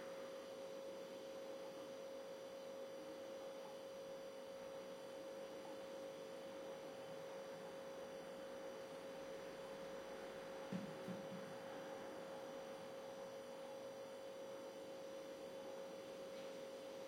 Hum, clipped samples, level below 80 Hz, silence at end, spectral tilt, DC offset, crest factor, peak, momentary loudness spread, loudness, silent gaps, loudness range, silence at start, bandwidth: none; under 0.1%; -86 dBFS; 0 s; -4.5 dB/octave; under 0.1%; 18 dB; -36 dBFS; 2 LU; -53 LUFS; none; 2 LU; 0 s; 16.5 kHz